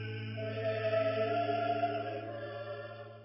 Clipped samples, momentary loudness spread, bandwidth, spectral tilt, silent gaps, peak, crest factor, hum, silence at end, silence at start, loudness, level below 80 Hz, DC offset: under 0.1%; 11 LU; 5.6 kHz; -4.5 dB/octave; none; -22 dBFS; 14 dB; none; 0 s; 0 s; -35 LUFS; -74 dBFS; under 0.1%